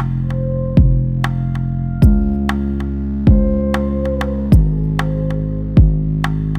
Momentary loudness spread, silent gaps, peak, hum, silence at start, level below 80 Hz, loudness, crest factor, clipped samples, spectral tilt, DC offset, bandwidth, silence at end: 7 LU; none; 0 dBFS; none; 0 s; -18 dBFS; -16 LUFS; 14 dB; under 0.1%; -9 dB/octave; under 0.1%; 9.6 kHz; 0 s